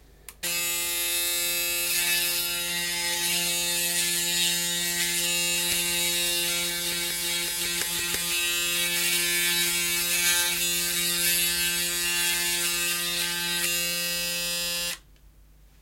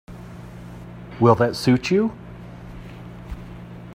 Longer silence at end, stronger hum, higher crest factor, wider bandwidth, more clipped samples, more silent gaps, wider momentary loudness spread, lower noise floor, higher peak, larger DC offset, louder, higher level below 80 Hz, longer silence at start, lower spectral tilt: first, 0.85 s vs 0 s; neither; about the same, 20 dB vs 22 dB; about the same, 16.5 kHz vs 15.5 kHz; neither; neither; second, 4 LU vs 21 LU; first, -54 dBFS vs -38 dBFS; second, -8 dBFS vs 0 dBFS; neither; second, -24 LUFS vs -19 LUFS; second, -54 dBFS vs -44 dBFS; first, 0.3 s vs 0.1 s; second, 0 dB/octave vs -7 dB/octave